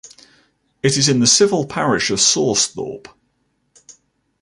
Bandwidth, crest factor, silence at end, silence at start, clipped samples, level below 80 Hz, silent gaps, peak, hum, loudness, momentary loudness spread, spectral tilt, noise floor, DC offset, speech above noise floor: 11.5 kHz; 18 dB; 1.45 s; 0.05 s; under 0.1%; -54 dBFS; none; -2 dBFS; none; -15 LUFS; 14 LU; -3 dB/octave; -67 dBFS; under 0.1%; 50 dB